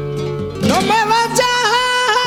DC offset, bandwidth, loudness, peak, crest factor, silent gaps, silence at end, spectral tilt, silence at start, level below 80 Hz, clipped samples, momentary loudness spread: under 0.1%; 18.5 kHz; -15 LUFS; -4 dBFS; 12 dB; none; 0 s; -3 dB/octave; 0 s; -44 dBFS; under 0.1%; 9 LU